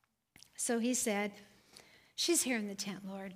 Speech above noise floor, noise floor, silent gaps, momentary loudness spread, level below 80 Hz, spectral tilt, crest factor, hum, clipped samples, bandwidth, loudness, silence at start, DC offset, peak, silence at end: 29 dB; -65 dBFS; none; 13 LU; -78 dBFS; -2.5 dB/octave; 18 dB; none; under 0.1%; 15.5 kHz; -35 LUFS; 0.6 s; under 0.1%; -20 dBFS; 0 s